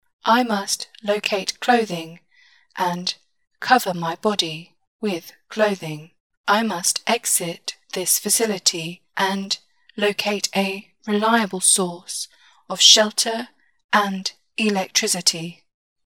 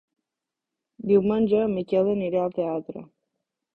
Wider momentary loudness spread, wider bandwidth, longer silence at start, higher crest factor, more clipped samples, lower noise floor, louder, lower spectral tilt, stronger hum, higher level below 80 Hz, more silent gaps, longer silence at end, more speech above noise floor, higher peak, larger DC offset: about the same, 15 LU vs 14 LU; first, 18 kHz vs 4.5 kHz; second, 0.25 s vs 1 s; first, 22 dB vs 16 dB; neither; second, -57 dBFS vs -87 dBFS; first, -20 LUFS vs -24 LUFS; second, -2 dB/octave vs -10 dB/octave; neither; second, -76 dBFS vs -60 dBFS; first, 4.87-4.99 s, 6.20-6.30 s, 6.37-6.44 s, 13.84-13.89 s vs none; second, 0.55 s vs 0.75 s; second, 36 dB vs 64 dB; first, 0 dBFS vs -8 dBFS; neither